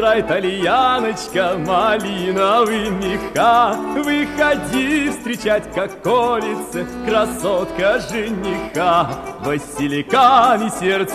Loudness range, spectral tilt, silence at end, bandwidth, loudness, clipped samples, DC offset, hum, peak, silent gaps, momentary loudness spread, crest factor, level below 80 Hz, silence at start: 3 LU; -4.5 dB/octave; 0 s; 14 kHz; -17 LUFS; under 0.1%; under 0.1%; none; -2 dBFS; none; 9 LU; 14 dB; -44 dBFS; 0 s